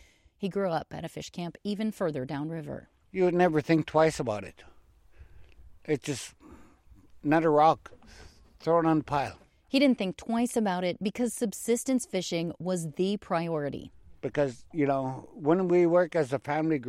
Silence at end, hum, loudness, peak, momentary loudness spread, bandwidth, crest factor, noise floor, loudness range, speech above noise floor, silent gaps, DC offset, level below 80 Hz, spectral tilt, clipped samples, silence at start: 0 s; none; -28 LUFS; -10 dBFS; 14 LU; 15.5 kHz; 20 dB; -56 dBFS; 4 LU; 28 dB; none; under 0.1%; -60 dBFS; -5.5 dB/octave; under 0.1%; 0.4 s